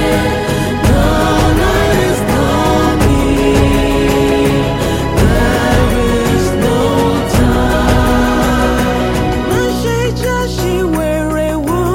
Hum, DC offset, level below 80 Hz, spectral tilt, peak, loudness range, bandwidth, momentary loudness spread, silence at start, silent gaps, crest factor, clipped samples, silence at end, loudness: none; under 0.1%; -20 dBFS; -5.5 dB/octave; 0 dBFS; 2 LU; 16.5 kHz; 4 LU; 0 s; none; 12 dB; under 0.1%; 0 s; -12 LUFS